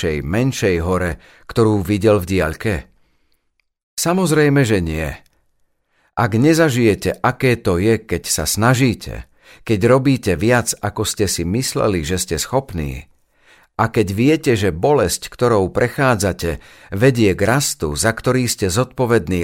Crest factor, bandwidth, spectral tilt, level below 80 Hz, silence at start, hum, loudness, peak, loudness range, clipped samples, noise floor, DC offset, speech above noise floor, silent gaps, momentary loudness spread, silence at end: 16 dB; 16.5 kHz; -5 dB/octave; -38 dBFS; 0 s; none; -17 LUFS; 0 dBFS; 3 LU; under 0.1%; -66 dBFS; under 0.1%; 49 dB; 3.83-3.97 s; 11 LU; 0 s